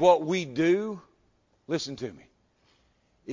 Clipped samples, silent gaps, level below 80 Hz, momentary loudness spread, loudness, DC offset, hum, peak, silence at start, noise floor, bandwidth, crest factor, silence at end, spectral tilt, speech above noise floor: under 0.1%; none; -68 dBFS; 16 LU; -28 LUFS; under 0.1%; none; -8 dBFS; 0 s; -68 dBFS; 7.6 kHz; 20 dB; 0 s; -5.5 dB/octave; 42 dB